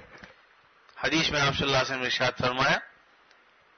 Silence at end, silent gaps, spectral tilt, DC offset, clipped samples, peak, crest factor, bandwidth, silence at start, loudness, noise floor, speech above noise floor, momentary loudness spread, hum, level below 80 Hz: 0.95 s; none; -3.5 dB/octave; under 0.1%; under 0.1%; -14 dBFS; 16 dB; 6.6 kHz; 0 s; -25 LUFS; -60 dBFS; 34 dB; 4 LU; none; -54 dBFS